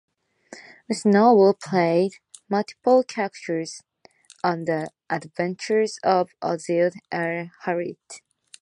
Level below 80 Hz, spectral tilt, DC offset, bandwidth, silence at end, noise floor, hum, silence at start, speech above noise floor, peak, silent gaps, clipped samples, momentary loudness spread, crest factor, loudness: -74 dBFS; -6 dB/octave; under 0.1%; 11 kHz; 0.45 s; -54 dBFS; none; 0.5 s; 32 dB; -4 dBFS; none; under 0.1%; 15 LU; 18 dB; -23 LUFS